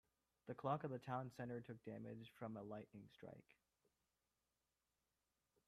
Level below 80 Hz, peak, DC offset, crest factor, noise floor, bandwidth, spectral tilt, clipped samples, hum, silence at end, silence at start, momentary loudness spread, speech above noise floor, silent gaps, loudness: -86 dBFS; -30 dBFS; under 0.1%; 24 dB; under -90 dBFS; 14 kHz; -8 dB/octave; under 0.1%; none; 2.25 s; 0.45 s; 16 LU; over 39 dB; none; -51 LUFS